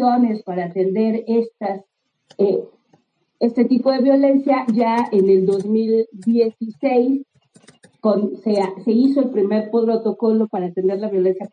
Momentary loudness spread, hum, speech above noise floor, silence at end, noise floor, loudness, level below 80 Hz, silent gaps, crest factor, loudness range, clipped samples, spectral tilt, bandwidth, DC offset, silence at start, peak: 7 LU; none; 43 dB; 0.05 s; -60 dBFS; -18 LUFS; -76 dBFS; none; 14 dB; 4 LU; under 0.1%; -8.5 dB/octave; 9.4 kHz; under 0.1%; 0 s; -4 dBFS